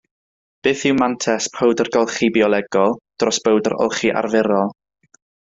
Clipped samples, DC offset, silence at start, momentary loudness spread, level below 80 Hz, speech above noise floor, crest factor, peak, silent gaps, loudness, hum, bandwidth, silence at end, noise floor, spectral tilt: under 0.1%; under 0.1%; 0.65 s; 4 LU; -58 dBFS; over 73 dB; 18 dB; -2 dBFS; none; -18 LUFS; none; 8 kHz; 0.75 s; under -90 dBFS; -4 dB/octave